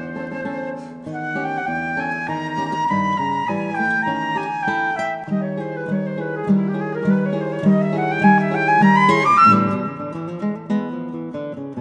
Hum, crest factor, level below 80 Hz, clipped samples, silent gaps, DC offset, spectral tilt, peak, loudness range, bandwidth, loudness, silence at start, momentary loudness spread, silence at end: none; 18 dB; -62 dBFS; under 0.1%; none; under 0.1%; -7 dB/octave; -2 dBFS; 7 LU; 9.6 kHz; -20 LUFS; 0 s; 15 LU; 0 s